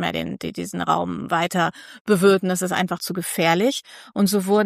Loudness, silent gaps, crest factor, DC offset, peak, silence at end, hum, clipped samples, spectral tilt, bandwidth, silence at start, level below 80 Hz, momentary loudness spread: -21 LUFS; 2.01-2.05 s; 18 dB; under 0.1%; -4 dBFS; 0 s; none; under 0.1%; -4.5 dB/octave; 15.5 kHz; 0 s; -60 dBFS; 12 LU